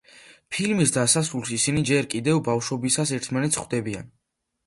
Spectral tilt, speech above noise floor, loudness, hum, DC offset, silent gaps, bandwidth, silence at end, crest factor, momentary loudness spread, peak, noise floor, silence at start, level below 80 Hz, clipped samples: -4 dB/octave; 27 dB; -23 LUFS; none; under 0.1%; none; 12 kHz; 0.6 s; 18 dB; 8 LU; -6 dBFS; -51 dBFS; 0.15 s; -56 dBFS; under 0.1%